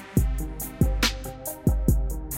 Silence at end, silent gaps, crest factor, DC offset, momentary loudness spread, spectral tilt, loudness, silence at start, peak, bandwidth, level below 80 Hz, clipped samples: 0 s; none; 18 dB; under 0.1%; 10 LU; -5 dB/octave; -26 LUFS; 0 s; -6 dBFS; 17 kHz; -28 dBFS; under 0.1%